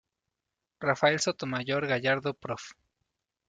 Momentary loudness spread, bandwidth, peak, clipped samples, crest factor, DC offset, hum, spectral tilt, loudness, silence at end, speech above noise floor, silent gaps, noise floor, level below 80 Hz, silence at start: 13 LU; 9.4 kHz; -10 dBFS; under 0.1%; 22 dB; under 0.1%; none; -4 dB/octave; -29 LUFS; 0.75 s; 58 dB; none; -87 dBFS; -70 dBFS; 0.8 s